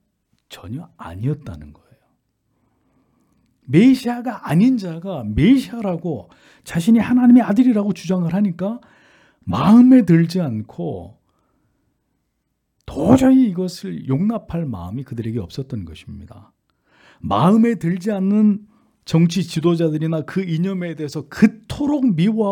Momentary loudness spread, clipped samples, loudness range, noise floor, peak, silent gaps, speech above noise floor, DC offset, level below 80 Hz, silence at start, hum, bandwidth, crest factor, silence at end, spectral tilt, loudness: 20 LU; under 0.1%; 8 LU; -72 dBFS; 0 dBFS; none; 55 dB; under 0.1%; -46 dBFS; 0.5 s; none; 13.5 kHz; 18 dB; 0 s; -7.5 dB/octave; -18 LUFS